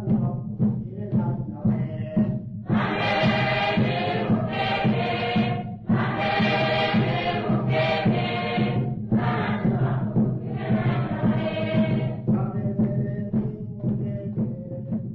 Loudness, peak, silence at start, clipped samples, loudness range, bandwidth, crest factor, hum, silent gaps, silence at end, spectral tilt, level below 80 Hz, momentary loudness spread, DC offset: -24 LUFS; -10 dBFS; 0 s; under 0.1%; 2 LU; 6 kHz; 12 dB; none; none; 0 s; -8.5 dB/octave; -48 dBFS; 7 LU; under 0.1%